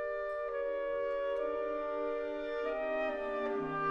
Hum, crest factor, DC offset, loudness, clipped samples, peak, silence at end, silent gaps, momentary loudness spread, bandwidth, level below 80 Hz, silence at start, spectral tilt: none; 12 dB; under 0.1%; -36 LUFS; under 0.1%; -24 dBFS; 0 s; none; 2 LU; 6.8 kHz; -62 dBFS; 0 s; -6.5 dB/octave